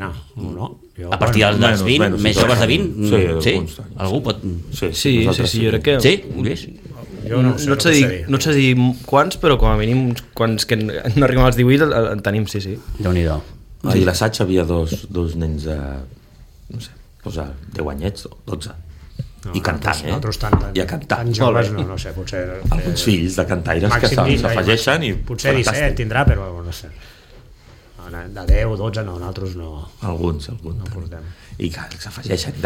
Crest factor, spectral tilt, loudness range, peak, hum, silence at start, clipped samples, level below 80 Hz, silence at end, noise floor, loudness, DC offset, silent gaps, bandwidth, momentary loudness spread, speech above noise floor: 18 dB; -5.5 dB/octave; 11 LU; 0 dBFS; none; 0 s; under 0.1%; -28 dBFS; 0 s; -44 dBFS; -18 LUFS; under 0.1%; none; 17 kHz; 17 LU; 26 dB